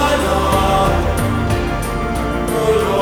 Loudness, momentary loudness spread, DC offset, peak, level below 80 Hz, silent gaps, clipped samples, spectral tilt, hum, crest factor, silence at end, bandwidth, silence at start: -17 LUFS; 6 LU; under 0.1%; -2 dBFS; -24 dBFS; none; under 0.1%; -5.5 dB/octave; none; 14 dB; 0 s; over 20 kHz; 0 s